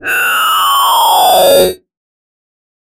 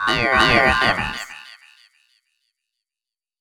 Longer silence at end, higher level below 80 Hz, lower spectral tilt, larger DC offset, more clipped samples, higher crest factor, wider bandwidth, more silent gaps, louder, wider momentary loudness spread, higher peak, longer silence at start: second, 1.25 s vs 1.85 s; second, -48 dBFS vs -40 dBFS; second, -1 dB/octave vs -4 dB/octave; neither; neither; second, 12 dB vs 22 dB; second, 17 kHz vs 19.5 kHz; neither; first, -8 LUFS vs -16 LUFS; second, 4 LU vs 19 LU; about the same, 0 dBFS vs 0 dBFS; about the same, 0 s vs 0 s